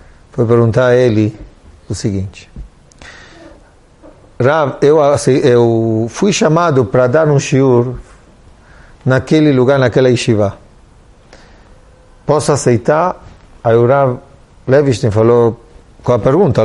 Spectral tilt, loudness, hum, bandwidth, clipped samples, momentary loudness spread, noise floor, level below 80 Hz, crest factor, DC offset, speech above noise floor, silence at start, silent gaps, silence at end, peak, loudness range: -6.5 dB/octave; -12 LUFS; none; 11.5 kHz; under 0.1%; 11 LU; -43 dBFS; -40 dBFS; 12 dB; under 0.1%; 33 dB; 0.35 s; none; 0 s; 0 dBFS; 6 LU